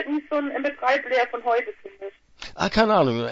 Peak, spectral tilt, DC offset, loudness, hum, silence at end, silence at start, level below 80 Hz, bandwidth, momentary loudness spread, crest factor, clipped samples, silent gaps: -2 dBFS; -5.5 dB/octave; under 0.1%; -23 LUFS; none; 0 s; 0 s; -50 dBFS; 8 kHz; 21 LU; 22 dB; under 0.1%; none